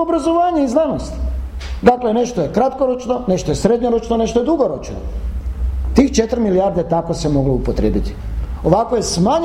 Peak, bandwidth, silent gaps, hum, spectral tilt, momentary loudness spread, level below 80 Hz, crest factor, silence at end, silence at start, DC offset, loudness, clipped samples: 0 dBFS; 13 kHz; none; none; -6.5 dB/octave; 11 LU; -26 dBFS; 16 dB; 0 s; 0 s; under 0.1%; -17 LUFS; under 0.1%